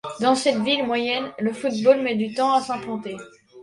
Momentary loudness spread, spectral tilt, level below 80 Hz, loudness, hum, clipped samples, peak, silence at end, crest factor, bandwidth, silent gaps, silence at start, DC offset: 12 LU; -4 dB/octave; -66 dBFS; -22 LUFS; none; under 0.1%; -4 dBFS; 0 s; 18 dB; 11.5 kHz; none; 0.05 s; under 0.1%